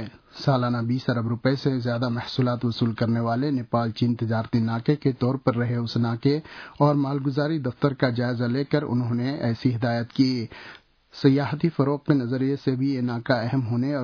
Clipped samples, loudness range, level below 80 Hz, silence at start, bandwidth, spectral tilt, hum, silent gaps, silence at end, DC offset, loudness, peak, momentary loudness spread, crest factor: under 0.1%; 1 LU; -60 dBFS; 0 s; 5.4 kHz; -8.5 dB/octave; none; none; 0 s; under 0.1%; -24 LUFS; -6 dBFS; 4 LU; 18 dB